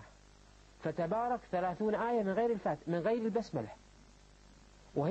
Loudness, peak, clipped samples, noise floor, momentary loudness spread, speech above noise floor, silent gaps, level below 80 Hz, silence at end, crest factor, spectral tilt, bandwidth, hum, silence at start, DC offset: -35 LUFS; -22 dBFS; under 0.1%; -60 dBFS; 9 LU; 26 dB; none; -64 dBFS; 0 s; 14 dB; -7.5 dB/octave; 8.6 kHz; 50 Hz at -60 dBFS; 0 s; under 0.1%